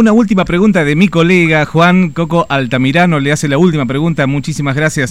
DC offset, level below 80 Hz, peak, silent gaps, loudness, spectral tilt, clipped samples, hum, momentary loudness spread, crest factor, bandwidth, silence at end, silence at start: 2%; -38 dBFS; 0 dBFS; none; -11 LUFS; -6 dB/octave; 0.2%; none; 5 LU; 10 dB; 13 kHz; 0 s; 0 s